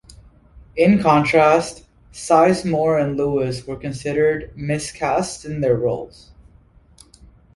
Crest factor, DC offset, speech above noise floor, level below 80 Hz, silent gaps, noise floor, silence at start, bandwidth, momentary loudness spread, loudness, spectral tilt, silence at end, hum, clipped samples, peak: 18 dB; under 0.1%; 33 dB; -46 dBFS; none; -51 dBFS; 0.75 s; 11.5 kHz; 14 LU; -19 LUFS; -6 dB/octave; 1.45 s; none; under 0.1%; -2 dBFS